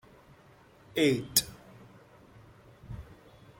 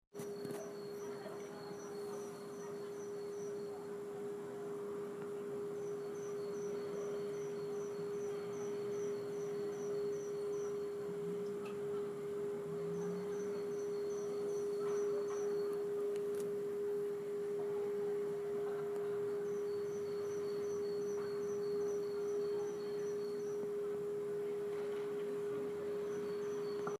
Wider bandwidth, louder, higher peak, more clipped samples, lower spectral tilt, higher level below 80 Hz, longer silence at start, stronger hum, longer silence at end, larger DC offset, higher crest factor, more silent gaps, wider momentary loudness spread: about the same, 16.5 kHz vs 15 kHz; first, -28 LUFS vs -41 LUFS; first, -6 dBFS vs -28 dBFS; neither; second, -3 dB/octave vs -5.5 dB/octave; first, -58 dBFS vs -84 dBFS; first, 0.95 s vs 0.15 s; neither; first, 0.45 s vs 0.05 s; neither; first, 28 dB vs 14 dB; neither; first, 24 LU vs 7 LU